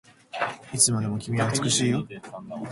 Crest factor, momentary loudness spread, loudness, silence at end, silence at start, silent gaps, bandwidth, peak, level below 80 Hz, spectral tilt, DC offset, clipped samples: 20 dB; 18 LU; -24 LUFS; 0 s; 0.35 s; none; 11.5 kHz; -6 dBFS; -60 dBFS; -3.5 dB/octave; under 0.1%; under 0.1%